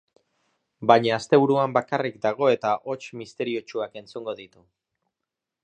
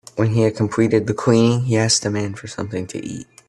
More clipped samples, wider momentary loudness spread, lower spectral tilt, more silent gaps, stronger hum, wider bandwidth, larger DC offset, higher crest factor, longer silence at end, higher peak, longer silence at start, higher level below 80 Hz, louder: neither; about the same, 15 LU vs 13 LU; about the same, -6 dB/octave vs -5 dB/octave; neither; neither; second, 9.2 kHz vs 11.5 kHz; neither; first, 24 dB vs 16 dB; first, 1.15 s vs 0.25 s; about the same, -2 dBFS vs -2 dBFS; first, 0.8 s vs 0.15 s; second, -72 dBFS vs -52 dBFS; second, -23 LUFS vs -18 LUFS